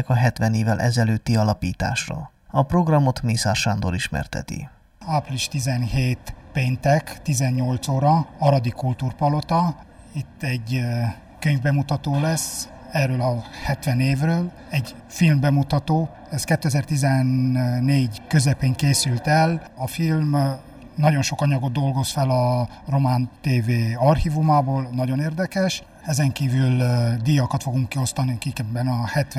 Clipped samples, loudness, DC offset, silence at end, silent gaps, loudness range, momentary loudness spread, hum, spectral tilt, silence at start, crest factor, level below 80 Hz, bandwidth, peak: under 0.1%; -22 LUFS; under 0.1%; 0 s; none; 3 LU; 8 LU; none; -6 dB/octave; 0 s; 16 dB; -42 dBFS; 14.5 kHz; -4 dBFS